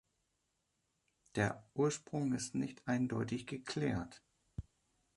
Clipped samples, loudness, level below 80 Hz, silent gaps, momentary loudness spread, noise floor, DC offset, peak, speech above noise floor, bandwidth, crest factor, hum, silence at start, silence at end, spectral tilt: under 0.1%; -38 LUFS; -64 dBFS; none; 15 LU; -83 dBFS; under 0.1%; -18 dBFS; 45 dB; 11.5 kHz; 22 dB; none; 1.35 s; 0.55 s; -5.5 dB/octave